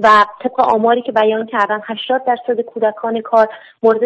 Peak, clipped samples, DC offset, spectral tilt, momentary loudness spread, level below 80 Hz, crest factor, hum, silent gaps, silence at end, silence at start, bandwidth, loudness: -2 dBFS; under 0.1%; under 0.1%; -5 dB/octave; 6 LU; -60 dBFS; 14 dB; none; none; 0 s; 0 s; 8.6 kHz; -15 LUFS